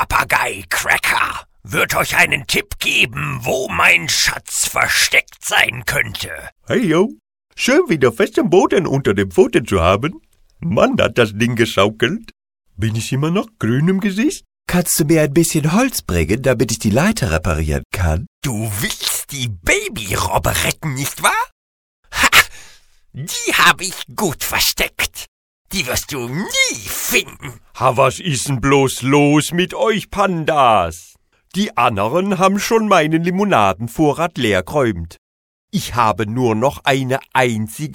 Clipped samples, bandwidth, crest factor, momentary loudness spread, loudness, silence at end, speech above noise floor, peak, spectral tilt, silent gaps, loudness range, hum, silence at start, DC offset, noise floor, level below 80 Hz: under 0.1%; 18 kHz; 16 dB; 9 LU; -16 LUFS; 0 s; 29 dB; 0 dBFS; -4 dB/octave; 6.52-6.56 s, 17.85-17.90 s, 18.27-18.42 s, 21.52-22.03 s, 25.28-25.65 s, 35.18-35.68 s; 4 LU; none; 0 s; under 0.1%; -46 dBFS; -36 dBFS